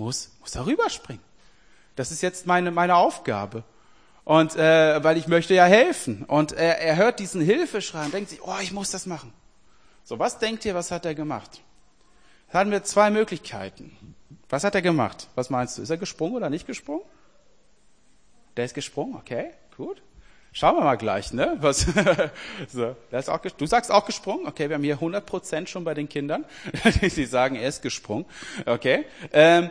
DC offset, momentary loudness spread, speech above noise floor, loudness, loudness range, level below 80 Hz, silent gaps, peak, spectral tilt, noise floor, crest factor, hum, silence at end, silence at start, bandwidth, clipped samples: 0.2%; 16 LU; 39 dB; -23 LUFS; 11 LU; -46 dBFS; none; 0 dBFS; -4.5 dB/octave; -62 dBFS; 24 dB; none; 0 s; 0 s; 10.5 kHz; under 0.1%